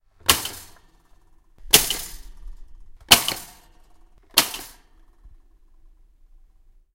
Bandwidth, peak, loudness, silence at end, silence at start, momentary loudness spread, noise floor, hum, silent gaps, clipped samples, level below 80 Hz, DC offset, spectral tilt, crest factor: 17 kHz; 0 dBFS; -19 LUFS; 1.65 s; 0.25 s; 21 LU; -54 dBFS; none; none; under 0.1%; -44 dBFS; under 0.1%; 0 dB/octave; 26 dB